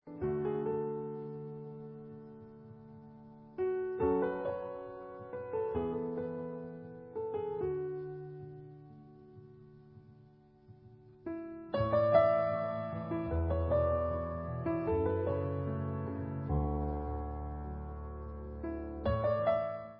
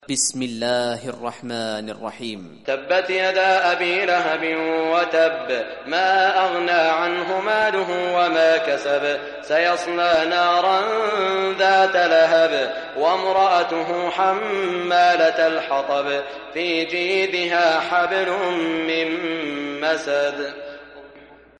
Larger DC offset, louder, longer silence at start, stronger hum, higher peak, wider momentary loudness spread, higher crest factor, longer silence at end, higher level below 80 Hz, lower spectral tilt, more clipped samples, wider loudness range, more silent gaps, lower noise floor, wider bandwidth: neither; second, -35 LUFS vs -20 LUFS; about the same, 0.05 s vs 0.1 s; neither; second, -14 dBFS vs -6 dBFS; first, 21 LU vs 11 LU; first, 22 dB vs 14 dB; second, 0 s vs 0.4 s; first, -46 dBFS vs -64 dBFS; first, -8 dB/octave vs -2.5 dB/octave; neither; first, 11 LU vs 4 LU; neither; first, -61 dBFS vs -46 dBFS; second, 5.2 kHz vs 11.5 kHz